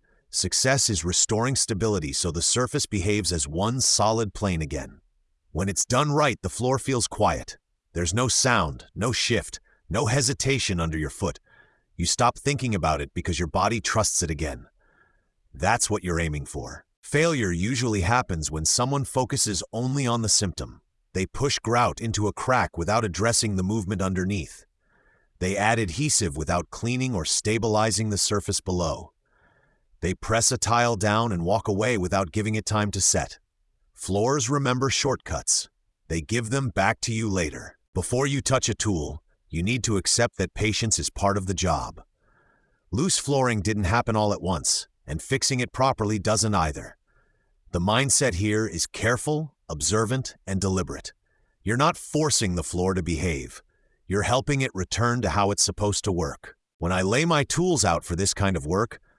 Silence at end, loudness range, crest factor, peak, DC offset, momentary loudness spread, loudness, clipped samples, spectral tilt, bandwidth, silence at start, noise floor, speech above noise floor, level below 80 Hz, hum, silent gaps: 0.2 s; 2 LU; 20 dB; -6 dBFS; under 0.1%; 10 LU; -24 LUFS; under 0.1%; -3.5 dB/octave; 12 kHz; 0.35 s; -68 dBFS; 44 dB; -44 dBFS; none; 16.97-17.02 s, 37.88-37.93 s, 56.74-56.79 s